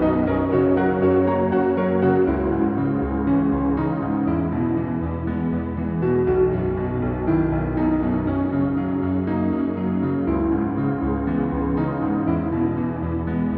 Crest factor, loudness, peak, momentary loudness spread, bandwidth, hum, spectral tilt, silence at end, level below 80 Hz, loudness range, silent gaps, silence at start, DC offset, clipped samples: 14 dB; -22 LUFS; -8 dBFS; 5 LU; 4.3 kHz; none; -13 dB/octave; 0 s; -36 dBFS; 3 LU; none; 0 s; under 0.1%; under 0.1%